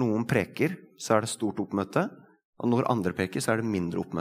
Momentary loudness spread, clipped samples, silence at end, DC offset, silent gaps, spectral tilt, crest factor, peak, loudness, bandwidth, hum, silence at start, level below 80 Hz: 5 LU; under 0.1%; 0 s; under 0.1%; 2.45-2.53 s; -6 dB/octave; 22 dB; -6 dBFS; -28 LUFS; 16 kHz; none; 0 s; -66 dBFS